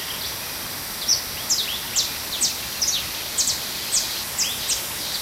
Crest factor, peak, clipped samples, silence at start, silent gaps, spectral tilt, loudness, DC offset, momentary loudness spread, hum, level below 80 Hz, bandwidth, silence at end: 20 dB; -6 dBFS; under 0.1%; 0 s; none; 0.5 dB/octave; -22 LUFS; under 0.1%; 6 LU; none; -50 dBFS; 16 kHz; 0 s